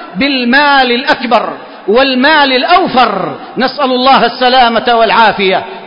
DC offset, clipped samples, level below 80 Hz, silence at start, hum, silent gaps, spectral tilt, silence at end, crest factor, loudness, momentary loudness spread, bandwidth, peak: under 0.1%; 0.2%; -44 dBFS; 0 s; none; none; -6 dB/octave; 0 s; 10 dB; -9 LUFS; 7 LU; 8 kHz; 0 dBFS